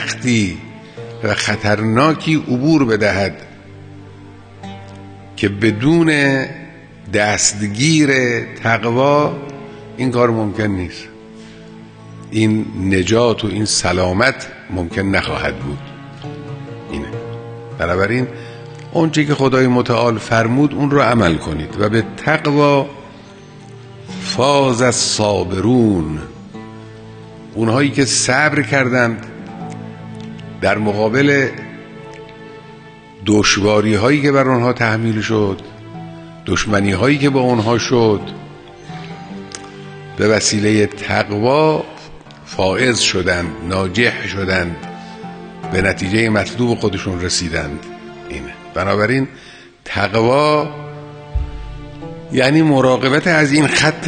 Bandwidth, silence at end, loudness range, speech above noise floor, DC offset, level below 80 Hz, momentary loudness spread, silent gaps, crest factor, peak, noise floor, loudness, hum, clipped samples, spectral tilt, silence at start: 10 kHz; 0 s; 4 LU; 23 dB; under 0.1%; -40 dBFS; 20 LU; none; 16 dB; 0 dBFS; -38 dBFS; -15 LUFS; none; under 0.1%; -4.5 dB/octave; 0 s